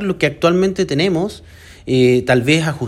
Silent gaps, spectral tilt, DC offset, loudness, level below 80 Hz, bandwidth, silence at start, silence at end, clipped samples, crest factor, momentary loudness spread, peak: none; -6 dB/octave; under 0.1%; -15 LUFS; -44 dBFS; 13.5 kHz; 0 s; 0 s; under 0.1%; 16 dB; 7 LU; 0 dBFS